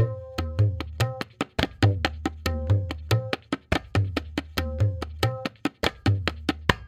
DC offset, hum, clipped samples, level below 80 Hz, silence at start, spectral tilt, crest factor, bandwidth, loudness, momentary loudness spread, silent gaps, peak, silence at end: under 0.1%; none; under 0.1%; -40 dBFS; 0 s; -6 dB/octave; 26 dB; 15.5 kHz; -27 LUFS; 7 LU; none; 0 dBFS; 0 s